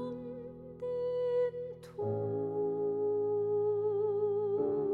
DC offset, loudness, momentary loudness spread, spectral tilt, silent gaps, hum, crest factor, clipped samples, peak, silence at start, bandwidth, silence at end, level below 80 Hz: under 0.1%; -34 LUFS; 12 LU; -9.5 dB/octave; none; none; 10 dB; under 0.1%; -22 dBFS; 0 s; 4.7 kHz; 0 s; -72 dBFS